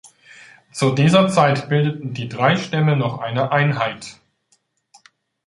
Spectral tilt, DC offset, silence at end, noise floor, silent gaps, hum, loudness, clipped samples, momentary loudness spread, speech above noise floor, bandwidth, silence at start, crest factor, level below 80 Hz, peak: -6 dB/octave; under 0.1%; 1.35 s; -64 dBFS; none; none; -18 LUFS; under 0.1%; 13 LU; 47 dB; 11.5 kHz; 0.05 s; 18 dB; -58 dBFS; 0 dBFS